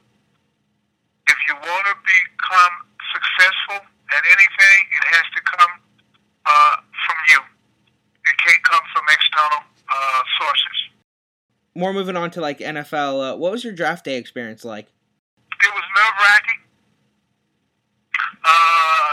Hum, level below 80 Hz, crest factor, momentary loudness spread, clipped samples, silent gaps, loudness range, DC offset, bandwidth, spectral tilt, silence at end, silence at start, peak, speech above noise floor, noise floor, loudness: none; -78 dBFS; 18 dB; 14 LU; under 0.1%; 11.04-11.49 s, 15.19-15.37 s; 10 LU; under 0.1%; 16 kHz; -1.5 dB/octave; 0 s; 1.25 s; 0 dBFS; 45 dB; -69 dBFS; -15 LUFS